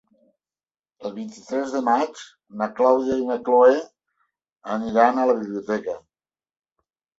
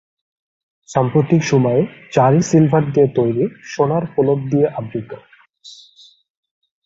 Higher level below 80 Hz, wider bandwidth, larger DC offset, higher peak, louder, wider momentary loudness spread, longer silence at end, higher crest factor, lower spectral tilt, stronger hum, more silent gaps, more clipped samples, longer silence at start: second, -64 dBFS vs -54 dBFS; about the same, 7.8 kHz vs 7.8 kHz; neither; about the same, -2 dBFS vs 0 dBFS; second, -21 LUFS vs -16 LUFS; first, 19 LU vs 11 LU; about the same, 1.2 s vs 1.1 s; about the same, 20 dB vs 18 dB; second, -5.5 dB/octave vs -7.5 dB/octave; neither; first, 4.52-4.56 s vs none; neither; about the same, 1 s vs 0.9 s